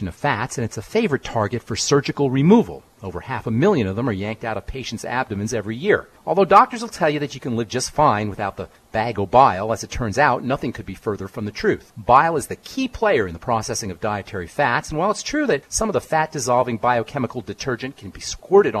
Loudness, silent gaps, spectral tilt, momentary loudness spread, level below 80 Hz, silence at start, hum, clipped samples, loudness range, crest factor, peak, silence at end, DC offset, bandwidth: -21 LUFS; none; -5 dB/octave; 13 LU; -44 dBFS; 0 s; none; under 0.1%; 3 LU; 20 dB; 0 dBFS; 0 s; under 0.1%; 13.5 kHz